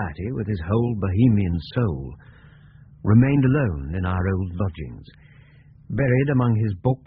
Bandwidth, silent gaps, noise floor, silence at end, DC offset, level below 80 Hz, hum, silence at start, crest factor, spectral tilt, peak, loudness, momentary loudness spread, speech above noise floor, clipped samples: 5 kHz; none; -49 dBFS; 0.1 s; under 0.1%; -40 dBFS; none; 0 s; 16 dB; -8.5 dB/octave; -6 dBFS; -22 LUFS; 13 LU; 28 dB; under 0.1%